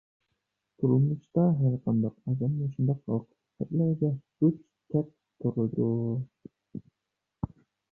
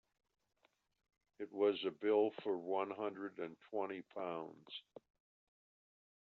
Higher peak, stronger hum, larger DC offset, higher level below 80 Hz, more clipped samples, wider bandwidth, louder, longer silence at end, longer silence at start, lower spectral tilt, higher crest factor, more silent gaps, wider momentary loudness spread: first, -12 dBFS vs -22 dBFS; neither; neither; first, -60 dBFS vs under -90 dBFS; neither; second, 1.5 kHz vs 4.4 kHz; first, -29 LUFS vs -40 LUFS; second, 0.45 s vs 1.4 s; second, 0.8 s vs 1.4 s; first, -14 dB/octave vs -3 dB/octave; about the same, 16 dB vs 20 dB; neither; about the same, 15 LU vs 15 LU